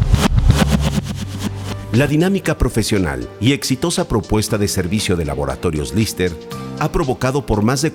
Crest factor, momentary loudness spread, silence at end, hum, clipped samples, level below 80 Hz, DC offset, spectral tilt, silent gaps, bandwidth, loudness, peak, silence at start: 16 dB; 9 LU; 0 s; none; under 0.1%; -26 dBFS; under 0.1%; -5.5 dB/octave; none; 18 kHz; -18 LUFS; -2 dBFS; 0 s